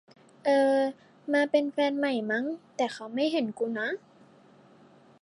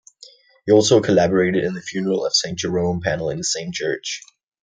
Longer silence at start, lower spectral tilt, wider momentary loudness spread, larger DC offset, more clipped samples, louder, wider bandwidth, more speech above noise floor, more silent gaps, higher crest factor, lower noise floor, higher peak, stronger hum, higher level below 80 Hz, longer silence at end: second, 0.45 s vs 0.65 s; about the same, -4.5 dB/octave vs -4 dB/octave; about the same, 9 LU vs 10 LU; neither; neither; second, -28 LUFS vs -19 LUFS; first, 11 kHz vs 9.6 kHz; about the same, 29 dB vs 29 dB; neither; about the same, 18 dB vs 18 dB; first, -57 dBFS vs -48 dBFS; second, -10 dBFS vs -2 dBFS; neither; second, -86 dBFS vs -56 dBFS; first, 1.25 s vs 0.45 s